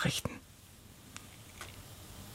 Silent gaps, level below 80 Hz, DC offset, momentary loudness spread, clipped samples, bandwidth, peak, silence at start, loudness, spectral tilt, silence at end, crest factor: none; -58 dBFS; under 0.1%; 18 LU; under 0.1%; 16.5 kHz; -20 dBFS; 0 s; -43 LUFS; -3.5 dB/octave; 0 s; 22 dB